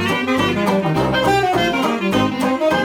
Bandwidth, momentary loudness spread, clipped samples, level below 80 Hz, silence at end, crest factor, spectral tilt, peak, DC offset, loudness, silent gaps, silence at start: 18 kHz; 2 LU; under 0.1%; -42 dBFS; 0 s; 12 dB; -5.5 dB/octave; -4 dBFS; under 0.1%; -17 LUFS; none; 0 s